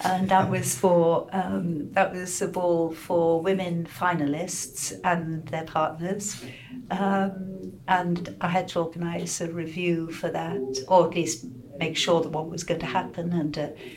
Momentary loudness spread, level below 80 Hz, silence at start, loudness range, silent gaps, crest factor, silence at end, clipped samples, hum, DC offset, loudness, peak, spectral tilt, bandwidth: 10 LU; -58 dBFS; 0 s; 4 LU; none; 20 dB; 0 s; under 0.1%; none; under 0.1%; -26 LUFS; -6 dBFS; -4.5 dB/octave; 16.5 kHz